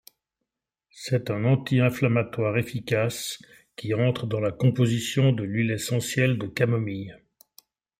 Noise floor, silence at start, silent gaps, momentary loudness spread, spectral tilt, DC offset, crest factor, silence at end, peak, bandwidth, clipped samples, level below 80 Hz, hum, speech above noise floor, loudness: -85 dBFS; 0.95 s; none; 11 LU; -6 dB/octave; under 0.1%; 20 dB; 0.85 s; -6 dBFS; 16 kHz; under 0.1%; -62 dBFS; none; 60 dB; -25 LUFS